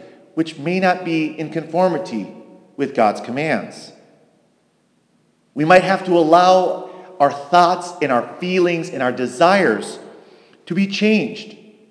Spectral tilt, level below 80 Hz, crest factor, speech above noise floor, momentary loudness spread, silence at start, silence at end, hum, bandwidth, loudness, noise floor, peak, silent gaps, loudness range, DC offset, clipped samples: -5.5 dB/octave; -68 dBFS; 18 dB; 44 dB; 16 LU; 0 s; 0.35 s; none; 11 kHz; -17 LUFS; -61 dBFS; 0 dBFS; none; 7 LU; under 0.1%; under 0.1%